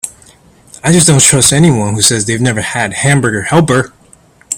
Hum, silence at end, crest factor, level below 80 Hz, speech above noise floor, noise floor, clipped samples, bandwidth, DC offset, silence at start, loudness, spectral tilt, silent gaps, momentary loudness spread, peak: none; 0 s; 12 dB; -42 dBFS; 35 dB; -44 dBFS; 0.3%; over 20 kHz; under 0.1%; 0.05 s; -9 LUFS; -3.5 dB/octave; none; 9 LU; 0 dBFS